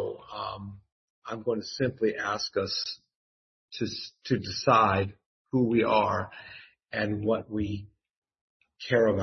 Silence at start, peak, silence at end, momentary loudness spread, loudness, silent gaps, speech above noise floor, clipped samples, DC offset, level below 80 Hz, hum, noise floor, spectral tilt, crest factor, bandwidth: 0 s; -8 dBFS; 0 s; 19 LU; -28 LUFS; 0.92-1.22 s, 3.15-3.68 s, 5.26-5.45 s, 8.17-8.22 s, 8.41-8.60 s; over 63 dB; under 0.1%; under 0.1%; -62 dBFS; none; under -90 dBFS; -5.5 dB/octave; 22 dB; 6.4 kHz